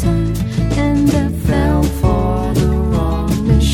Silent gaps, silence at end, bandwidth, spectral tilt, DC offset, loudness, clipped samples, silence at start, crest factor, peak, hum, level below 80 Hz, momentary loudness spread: none; 0 s; 17 kHz; -7 dB/octave; under 0.1%; -16 LUFS; under 0.1%; 0 s; 14 dB; 0 dBFS; none; -20 dBFS; 3 LU